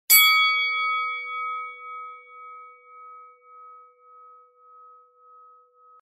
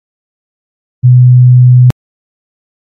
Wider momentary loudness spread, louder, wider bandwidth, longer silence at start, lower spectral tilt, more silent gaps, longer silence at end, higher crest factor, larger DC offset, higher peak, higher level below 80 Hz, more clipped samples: first, 29 LU vs 8 LU; second, -20 LUFS vs -6 LUFS; first, 15.5 kHz vs 1.6 kHz; second, 0.1 s vs 1.05 s; second, 6 dB/octave vs -11 dB/octave; neither; first, 2.3 s vs 0.95 s; first, 26 dB vs 8 dB; neither; about the same, -2 dBFS vs 0 dBFS; second, -86 dBFS vs -44 dBFS; neither